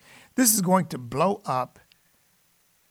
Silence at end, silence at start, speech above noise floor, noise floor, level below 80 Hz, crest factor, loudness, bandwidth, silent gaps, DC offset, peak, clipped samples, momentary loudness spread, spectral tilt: 1.25 s; 0.35 s; 41 dB; -65 dBFS; -64 dBFS; 22 dB; -23 LUFS; 19 kHz; none; under 0.1%; -6 dBFS; under 0.1%; 12 LU; -4 dB/octave